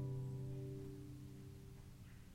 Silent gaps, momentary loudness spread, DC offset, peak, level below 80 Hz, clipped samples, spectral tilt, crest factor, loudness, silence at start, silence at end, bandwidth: none; 12 LU; under 0.1%; -36 dBFS; -62 dBFS; under 0.1%; -8 dB/octave; 14 dB; -51 LUFS; 0 s; 0 s; 16 kHz